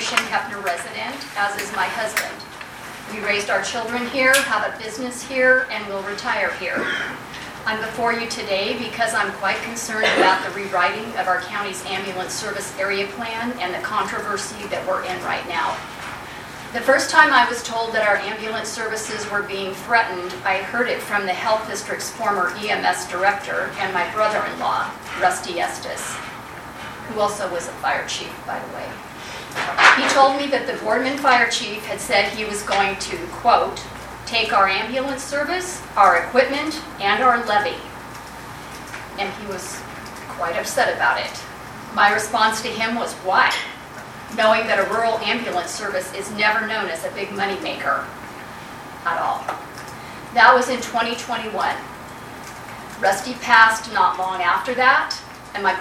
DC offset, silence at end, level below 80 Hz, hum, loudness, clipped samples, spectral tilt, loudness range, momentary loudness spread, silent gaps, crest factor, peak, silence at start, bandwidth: under 0.1%; 0 s; -52 dBFS; none; -20 LUFS; under 0.1%; -2.5 dB/octave; 6 LU; 17 LU; none; 22 dB; 0 dBFS; 0 s; 17 kHz